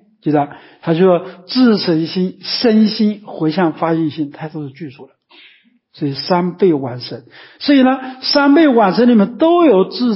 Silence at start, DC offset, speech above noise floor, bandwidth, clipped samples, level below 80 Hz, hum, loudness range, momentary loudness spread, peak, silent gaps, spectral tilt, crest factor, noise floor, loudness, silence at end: 0.25 s; under 0.1%; 36 dB; 5.8 kHz; under 0.1%; -64 dBFS; none; 8 LU; 16 LU; 0 dBFS; none; -9.5 dB/octave; 14 dB; -50 dBFS; -14 LUFS; 0 s